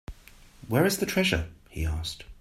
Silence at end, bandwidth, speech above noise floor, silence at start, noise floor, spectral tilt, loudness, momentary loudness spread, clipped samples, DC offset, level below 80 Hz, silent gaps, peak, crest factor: 0.05 s; 16 kHz; 25 dB; 0.1 s; -52 dBFS; -4.5 dB/octave; -27 LUFS; 13 LU; under 0.1%; under 0.1%; -42 dBFS; none; -8 dBFS; 20 dB